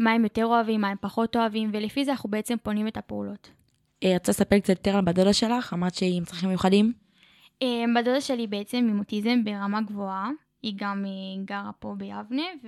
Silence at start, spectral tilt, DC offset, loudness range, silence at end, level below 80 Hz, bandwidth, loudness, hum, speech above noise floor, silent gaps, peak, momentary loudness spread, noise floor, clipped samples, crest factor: 0 s; -5.5 dB/octave; under 0.1%; 5 LU; 0 s; -56 dBFS; 14 kHz; -26 LUFS; none; 33 dB; none; -6 dBFS; 12 LU; -58 dBFS; under 0.1%; 20 dB